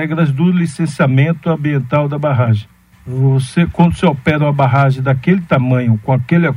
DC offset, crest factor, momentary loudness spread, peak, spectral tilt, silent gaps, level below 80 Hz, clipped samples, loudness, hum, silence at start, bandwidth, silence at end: under 0.1%; 12 dB; 4 LU; 0 dBFS; -8 dB/octave; none; -42 dBFS; under 0.1%; -14 LUFS; none; 0 s; 11.5 kHz; 0 s